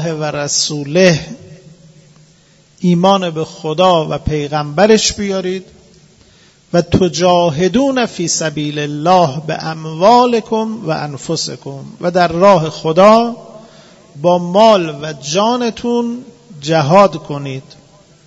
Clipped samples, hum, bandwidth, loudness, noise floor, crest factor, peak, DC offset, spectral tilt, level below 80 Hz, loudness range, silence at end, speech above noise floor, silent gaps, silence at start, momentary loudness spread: 0.2%; none; 8 kHz; -13 LUFS; -48 dBFS; 14 dB; 0 dBFS; under 0.1%; -5 dB/octave; -42 dBFS; 3 LU; 0.65 s; 35 dB; none; 0 s; 13 LU